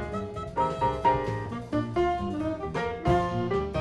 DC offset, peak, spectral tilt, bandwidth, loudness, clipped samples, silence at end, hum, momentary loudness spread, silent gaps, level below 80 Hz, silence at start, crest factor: under 0.1%; -12 dBFS; -7.5 dB/octave; 11.5 kHz; -28 LUFS; under 0.1%; 0 s; none; 7 LU; none; -44 dBFS; 0 s; 16 dB